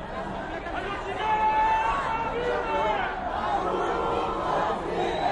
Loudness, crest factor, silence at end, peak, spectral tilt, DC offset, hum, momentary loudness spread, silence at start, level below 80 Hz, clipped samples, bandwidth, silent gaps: -27 LUFS; 14 dB; 0 s; -12 dBFS; -5.5 dB/octave; under 0.1%; none; 9 LU; 0 s; -44 dBFS; under 0.1%; 10.5 kHz; none